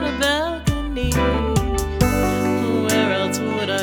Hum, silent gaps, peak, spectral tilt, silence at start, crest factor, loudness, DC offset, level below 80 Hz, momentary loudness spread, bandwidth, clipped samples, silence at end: none; none; -2 dBFS; -5 dB/octave; 0 s; 18 dB; -20 LUFS; under 0.1%; -28 dBFS; 5 LU; 19.5 kHz; under 0.1%; 0 s